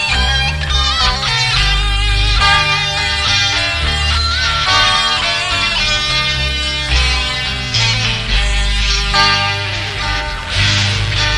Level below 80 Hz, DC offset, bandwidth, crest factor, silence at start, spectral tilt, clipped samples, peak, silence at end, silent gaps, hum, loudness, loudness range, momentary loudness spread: -20 dBFS; 0.4%; 12 kHz; 14 dB; 0 s; -2.5 dB/octave; under 0.1%; 0 dBFS; 0 s; none; none; -13 LUFS; 2 LU; 5 LU